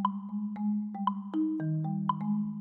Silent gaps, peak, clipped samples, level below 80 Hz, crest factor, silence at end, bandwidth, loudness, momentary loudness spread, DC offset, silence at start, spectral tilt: none; -14 dBFS; under 0.1%; -82 dBFS; 16 dB; 0 s; 3.6 kHz; -33 LUFS; 3 LU; under 0.1%; 0 s; -11 dB/octave